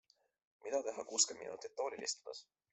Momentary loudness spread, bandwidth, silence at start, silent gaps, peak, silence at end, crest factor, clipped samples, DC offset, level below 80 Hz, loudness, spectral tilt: 18 LU; 8.2 kHz; 0.65 s; none; -16 dBFS; 0.3 s; 26 dB; under 0.1%; under 0.1%; -88 dBFS; -39 LUFS; 0.5 dB/octave